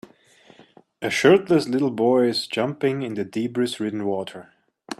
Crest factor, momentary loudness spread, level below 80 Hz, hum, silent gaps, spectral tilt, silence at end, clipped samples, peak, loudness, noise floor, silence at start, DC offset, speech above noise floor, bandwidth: 20 dB; 12 LU; -66 dBFS; none; none; -5.5 dB/octave; 0.05 s; under 0.1%; -2 dBFS; -22 LUFS; -54 dBFS; 1 s; under 0.1%; 32 dB; 13.5 kHz